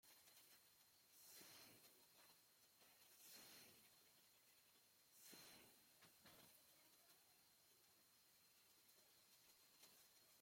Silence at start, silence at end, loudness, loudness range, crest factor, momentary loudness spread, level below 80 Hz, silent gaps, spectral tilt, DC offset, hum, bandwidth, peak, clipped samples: 0.05 s; 0 s; -66 LUFS; 2 LU; 20 dB; 6 LU; under -90 dBFS; none; -1 dB/octave; under 0.1%; none; 16.5 kHz; -50 dBFS; under 0.1%